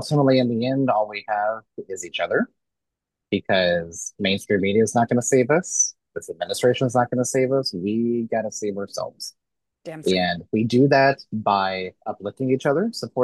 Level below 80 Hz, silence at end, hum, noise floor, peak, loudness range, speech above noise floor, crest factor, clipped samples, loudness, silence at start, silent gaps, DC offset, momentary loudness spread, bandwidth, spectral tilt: -64 dBFS; 0 s; none; -84 dBFS; -4 dBFS; 4 LU; 62 dB; 18 dB; under 0.1%; -22 LUFS; 0 s; none; under 0.1%; 13 LU; 12.5 kHz; -4.5 dB/octave